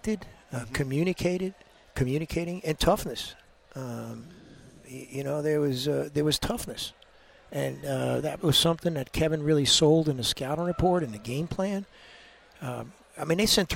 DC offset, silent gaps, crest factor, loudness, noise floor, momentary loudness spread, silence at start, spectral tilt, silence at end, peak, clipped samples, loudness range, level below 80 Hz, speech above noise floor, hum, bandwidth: under 0.1%; none; 20 dB; -27 LUFS; -56 dBFS; 16 LU; 0.05 s; -4.5 dB/octave; 0 s; -8 dBFS; under 0.1%; 7 LU; -46 dBFS; 28 dB; none; 16.5 kHz